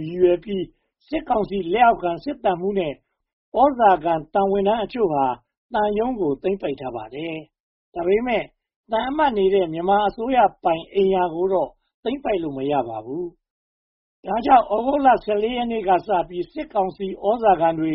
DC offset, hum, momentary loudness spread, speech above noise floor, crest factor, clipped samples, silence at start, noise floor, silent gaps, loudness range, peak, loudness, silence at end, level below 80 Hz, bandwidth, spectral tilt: under 0.1%; none; 13 LU; over 70 dB; 18 dB; under 0.1%; 0 s; under -90 dBFS; 3.33-3.52 s, 5.57-5.69 s, 7.60-7.92 s, 8.76-8.84 s, 11.94-12.03 s, 13.50-14.23 s; 4 LU; -2 dBFS; -21 LUFS; 0 s; -50 dBFS; 5.8 kHz; -4.5 dB/octave